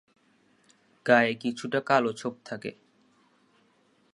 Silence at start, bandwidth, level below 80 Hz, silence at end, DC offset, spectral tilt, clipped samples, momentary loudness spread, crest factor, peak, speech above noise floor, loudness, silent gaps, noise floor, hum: 1.05 s; 11.5 kHz; -78 dBFS; 1.45 s; under 0.1%; -5 dB/octave; under 0.1%; 16 LU; 26 dB; -4 dBFS; 40 dB; -27 LUFS; none; -66 dBFS; none